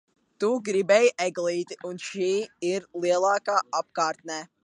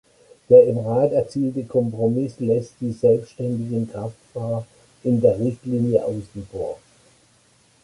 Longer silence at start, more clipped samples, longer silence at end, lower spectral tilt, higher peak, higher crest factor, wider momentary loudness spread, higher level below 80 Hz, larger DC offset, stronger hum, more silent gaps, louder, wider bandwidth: about the same, 0.4 s vs 0.5 s; neither; second, 0.2 s vs 1.05 s; second, -3.5 dB/octave vs -9.5 dB/octave; second, -8 dBFS vs -2 dBFS; about the same, 18 dB vs 20 dB; about the same, 14 LU vs 16 LU; second, -80 dBFS vs -56 dBFS; neither; neither; neither; second, -26 LUFS vs -21 LUFS; about the same, 11 kHz vs 11 kHz